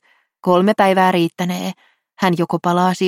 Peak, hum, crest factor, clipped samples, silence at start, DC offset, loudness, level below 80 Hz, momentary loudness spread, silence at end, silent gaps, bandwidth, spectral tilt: -2 dBFS; none; 16 dB; under 0.1%; 0.45 s; under 0.1%; -17 LUFS; -62 dBFS; 10 LU; 0 s; none; 16 kHz; -6 dB/octave